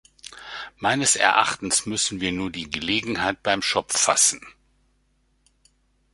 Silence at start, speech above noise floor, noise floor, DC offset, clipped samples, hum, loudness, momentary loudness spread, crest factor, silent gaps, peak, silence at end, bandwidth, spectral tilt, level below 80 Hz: 0.3 s; 43 dB; -66 dBFS; under 0.1%; under 0.1%; none; -21 LUFS; 19 LU; 24 dB; none; -2 dBFS; 1.65 s; 12 kHz; -1.5 dB/octave; -54 dBFS